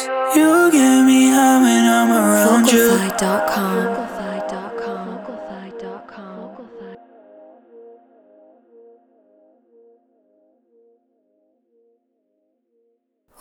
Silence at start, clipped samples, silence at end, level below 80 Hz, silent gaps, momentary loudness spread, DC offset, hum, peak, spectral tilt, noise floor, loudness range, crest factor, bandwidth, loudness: 0 s; under 0.1%; 6.45 s; -60 dBFS; none; 24 LU; under 0.1%; none; 0 dBFS; -4 dB/octave; -69 dBFS; 24 LU; 18 dB; over 20 kHz; -15 LUFS